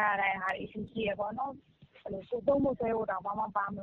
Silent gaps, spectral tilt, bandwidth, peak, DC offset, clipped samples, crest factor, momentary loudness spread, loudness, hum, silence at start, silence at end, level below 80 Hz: none; -4 dB/octave; 6.4 kHz; -16 dBFS; under 0.1%; under 0.1%; 18 dB; 13 LU; -33 LUFS; none; 0 s; 0 s; -60 dBFS